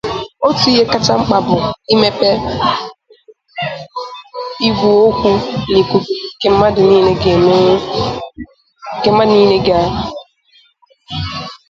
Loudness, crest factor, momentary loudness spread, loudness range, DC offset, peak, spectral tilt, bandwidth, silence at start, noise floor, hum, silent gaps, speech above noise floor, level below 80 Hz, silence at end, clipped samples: -13 LUFS; 14 dB; 16 LU; 4 LU; under 0.1%; 0 dBFS; -6 dB/octave; 7.6 kHz; 0.05 s; -52 dBFS; none; none; 40 dB; -38 dBFS; 0.15 s; under 0.1%